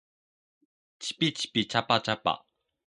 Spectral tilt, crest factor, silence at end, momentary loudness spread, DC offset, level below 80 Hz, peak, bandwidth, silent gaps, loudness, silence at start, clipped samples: -4 dB/octave; 24 dB; 0.5 s; 11 LU; under 0.1%; -68 dBFS; -8 dBFS; 11.5 kHz; none; -28 LUFS; 1 s; under 0.1%